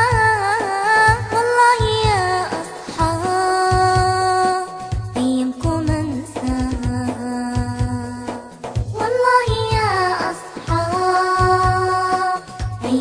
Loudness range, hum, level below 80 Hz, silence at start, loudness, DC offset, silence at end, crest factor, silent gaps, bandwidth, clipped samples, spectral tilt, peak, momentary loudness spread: 6 LU; none; -32 dBFS; 0 s; -18 LUFS; under 0.1%; 0 s; 16 dB; none; 10.5 kHz; under 0.1%; -5 dB/octave; -2 dBFS; 12 LU